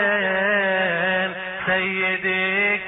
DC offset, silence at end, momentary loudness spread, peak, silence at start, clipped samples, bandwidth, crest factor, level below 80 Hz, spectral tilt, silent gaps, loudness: under 0.1%; 0 s; 4 LU; -8 dBFS; 0 s; under 0.1%; 4 kHz; 14 dB; -58 dBFS; -7.5 dB/octave; none; -20 LUFS